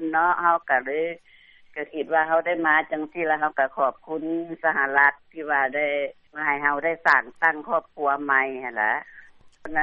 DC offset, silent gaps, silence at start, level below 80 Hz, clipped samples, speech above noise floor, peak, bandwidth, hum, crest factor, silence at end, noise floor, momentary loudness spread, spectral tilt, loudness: under 0.1%; none; 0 s; -64 dBFS; under 0.1%; 21 dB; -4 dBFS; 7.8 kHz; none; 20 dB; 0 s; -44 dBFS; 11 LU; -1.5 dB/octave; -23 LUFS